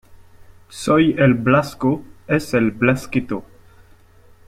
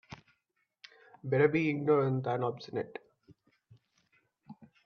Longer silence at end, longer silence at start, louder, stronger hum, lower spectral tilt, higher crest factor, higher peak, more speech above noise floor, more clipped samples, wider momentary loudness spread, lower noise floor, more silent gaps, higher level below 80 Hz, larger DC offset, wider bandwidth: first, 1.05 s vs 0.2 s; about the same, 0.1 s vs 0.1 s; first, -18 LUFS vs -31 LUFS; neither; second, -6.5 dB/octave vs -8.5 dB/octave; about the same, 18 dB vs 20 dB; first, -2 dBFS vs -14 dBFS; second, 31 dB vs 50 dB; neither; second, 13 LU vs 21 LU; second, -48 dBFS vs -80 dBFS; neither; first, -48 dBFS vs -74 dBFS; neither; first, 15 kHz vs 6.6 kHz